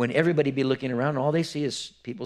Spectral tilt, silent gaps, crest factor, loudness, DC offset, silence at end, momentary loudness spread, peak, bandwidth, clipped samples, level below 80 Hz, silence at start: -6 dB/octave; none; 20 dB; -26 LUFS; under 0.1%; 0 s; 9 LU; -6 dBFS; 12.5 kHz; under 0.1%; -68 dBFS; 0 s